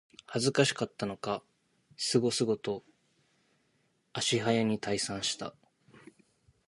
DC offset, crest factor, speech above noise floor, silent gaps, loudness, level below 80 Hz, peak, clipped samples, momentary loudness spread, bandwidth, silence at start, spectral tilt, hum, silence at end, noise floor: under 0.1%; 24 dB; 43 dB; none; -31 LUFS; -70 dBFS; -10 dBFS; under 0.1%; 11 LU; 11.5 kHz; 0.3 s; -4 dB/octave; none; 1.2 s; -73 dBFS